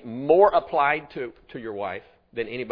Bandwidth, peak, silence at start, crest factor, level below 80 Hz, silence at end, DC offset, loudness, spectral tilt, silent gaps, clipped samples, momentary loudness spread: 5.2 kHz; -4 dBFS; 0.05 s; 20 dB; -58 dBFS; 0 s; under 0.1%; -22 LUFS; -8.5 dB/octave; none; under 0.1%; 19 LU